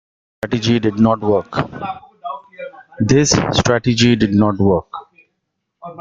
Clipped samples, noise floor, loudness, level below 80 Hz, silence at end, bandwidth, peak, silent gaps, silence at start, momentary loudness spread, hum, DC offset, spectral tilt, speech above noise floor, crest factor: under 0.1%; -74 dBFS; -15 LUFS; -44 dBFS; 0 s; 9.2 kHz; 0 dBFS; none; 0.45 s; 20 LU; none; under 0.1%; -5 dB/octave; 59 dB; 16 dB